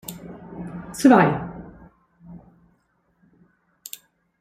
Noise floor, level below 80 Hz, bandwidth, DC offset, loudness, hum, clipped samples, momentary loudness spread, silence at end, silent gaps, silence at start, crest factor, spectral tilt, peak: -67 dBFS; -56 dBFS; 16 kHz; under 0.1%; -18 LUFS; none; under 0.1%; 26 LU; 2.05 s; none; 0.1 s; 22 dB; -6 dB/octave; -2 dBFS